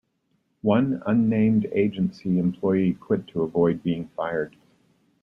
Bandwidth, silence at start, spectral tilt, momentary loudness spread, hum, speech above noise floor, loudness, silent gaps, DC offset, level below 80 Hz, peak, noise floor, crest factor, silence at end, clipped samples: 5.8 kHz; 0.65 s; -10 dB/octave; 7 LU; none; 48 dB; -24 LUFS; none; under 0.1%; -60 dBFS; -6 dBFS; -71 dBFS; 18 dB; 0.75 s; under 0.1%